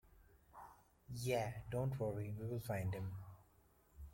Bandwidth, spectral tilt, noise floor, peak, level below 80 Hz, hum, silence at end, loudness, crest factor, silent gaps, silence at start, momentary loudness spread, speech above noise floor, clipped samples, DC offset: 16.5 kHz; -6.5 dB/octave; -72 dBFS; -26 dBFS; -64 dBFS; none; 0 s; -44 LUFS; 20 dB; none; 0.05 s; 19 LU; 29 dB; under 0.1%; under 0.1%